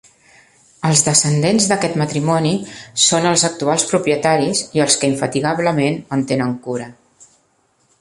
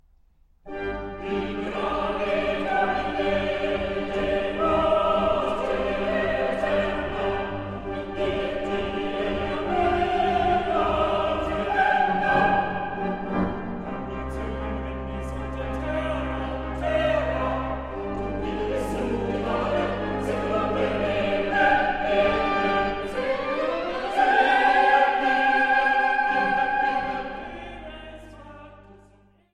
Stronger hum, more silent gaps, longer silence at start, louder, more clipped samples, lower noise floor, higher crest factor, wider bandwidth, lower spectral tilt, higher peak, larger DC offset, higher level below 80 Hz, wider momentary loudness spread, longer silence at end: neither; neither; first, 0.8 s vs 0.65 s; first, -16 LUFS vs -24 LUFS; neither; about the same, -61 dBFS vs -58 dBFS; about the same, 18 dB vs 18 dB; about the same, 11.5 kHz vs 11.5 kHz; second, -3.5 dB/octave vs -6 dB/octave; first, 0 dBFS vs -6 dBFS; neither; second, -56 dBFS vs -40 dBFS; about the same, 10 LU vs 12 LU; first, 1.1 s vs 0.55 s